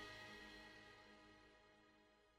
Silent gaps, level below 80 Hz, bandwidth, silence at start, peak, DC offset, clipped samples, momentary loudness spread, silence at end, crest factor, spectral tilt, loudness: none; -78 dBFS; 16 kHz; 0 s; -46 dBFS; under 0.1%; under 0.1%; 12 LU; 0 s; 18 dB; -3.5 dB/octave; -61 LUFS